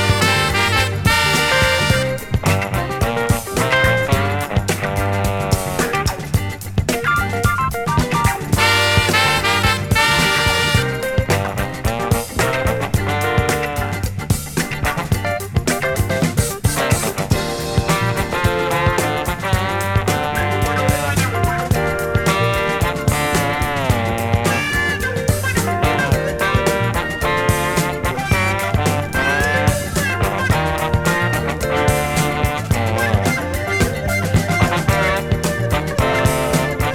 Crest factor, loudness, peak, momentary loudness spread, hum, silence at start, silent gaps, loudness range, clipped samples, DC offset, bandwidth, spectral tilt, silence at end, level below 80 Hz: 16 dB; -17 LUFS; 0 dBFS; 6 LU; none; 0 s; none; 4 LU; under 0.1%; under 0.1%; 18 kHz; -4.5 dB/octave; 0 s; -30 dBFS